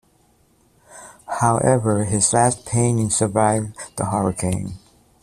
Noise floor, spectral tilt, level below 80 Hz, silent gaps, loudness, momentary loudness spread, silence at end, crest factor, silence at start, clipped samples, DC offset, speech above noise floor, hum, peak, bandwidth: -59 dBFS; -5 dB/octave; -48 dBFS; none; -19 LUFS; 12 LU; 0.45 s; 18 dB; 0.9 s; under 0.1%; under 0.1%; 40 dB; none; -2 dBFS; 14 kHz